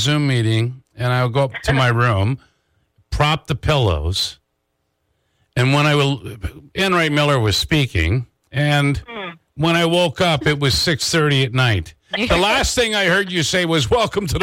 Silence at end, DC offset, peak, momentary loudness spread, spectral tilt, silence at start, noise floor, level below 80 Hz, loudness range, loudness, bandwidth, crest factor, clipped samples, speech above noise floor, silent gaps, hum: 0 s; under 0.1%; -6 dBFS; 10 LU; -4.5 dB/octave; 0 s; -71 dBFS; -36 dBFS; 4 LU; -17 LUFS; 16.5 kHz; 12 dB; under 0.1%; 53 dB; none; none